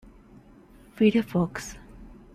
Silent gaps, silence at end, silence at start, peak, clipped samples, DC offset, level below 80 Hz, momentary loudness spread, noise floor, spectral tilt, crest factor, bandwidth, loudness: none; 0.3 s; 0.95 s; -10 dBFS; under 0.1%; under 0.1%; -52 dBFS; 19 LU; -52 dBFS; -6.5 dB/octave; 20 dB; 14.5 kHz; -25 LUFS